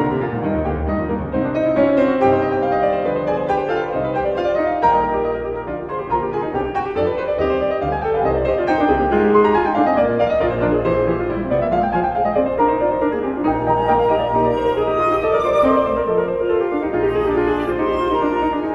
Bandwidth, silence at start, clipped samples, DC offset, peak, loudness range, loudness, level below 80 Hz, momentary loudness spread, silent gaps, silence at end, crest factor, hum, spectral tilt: 7.6 kHz; 0 s; under 0.1%; under 0.1%; -2 dBFS; 3 LU; -18 LUFS; -36 dBFS; 6 LU; none; 0 s; 14 dB; none; -8.5 dB/octave